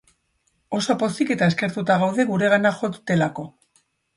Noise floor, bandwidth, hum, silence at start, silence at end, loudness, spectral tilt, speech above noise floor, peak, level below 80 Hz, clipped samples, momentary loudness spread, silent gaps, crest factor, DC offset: -69 dBFS; 11.5 kHz; none; 0.7 s; 0.7 s; -21 LUFS; -6 dB/octave; 48 dB; -4 dBFS; -62 dBFS; under 0.1%; 10 LU; none; 18 dB; under 0.1%